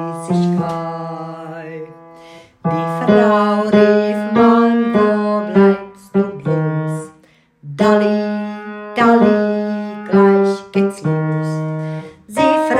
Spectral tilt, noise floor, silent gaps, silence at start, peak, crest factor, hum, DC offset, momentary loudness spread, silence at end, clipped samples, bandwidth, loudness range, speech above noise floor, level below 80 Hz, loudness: -7.5 dB/octave; -51 dBFS; none; 0 s; 0 dBFS; 14 dB; none; under 0.1%; 16 LU; 0 s; under 0.1%; 11 kHz; 5 LU; 36 dB; -58 dBFS; -15 LUFS